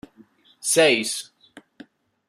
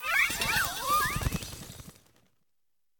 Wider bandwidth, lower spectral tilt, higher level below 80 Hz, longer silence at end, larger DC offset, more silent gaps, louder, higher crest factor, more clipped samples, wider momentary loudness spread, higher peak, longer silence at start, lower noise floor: second, 15 kHz vs 19 kHz; about the same, -1.5 dB/octave vs -2 dB/octave; second, -70 dBFS vs -46 dBFS; about the same, 1.05 s vs 1.1 s; neither; neither; first, -20 LUFS vs -28 LUFS; about the same, 20 dB vs 18 dB; neither; second, 15 LU vs 19 LU; first, -4 dBFS vs -14 dBFS; first, 0.65 s vs 0 s; second, -55 dBFS vs -85 dBFS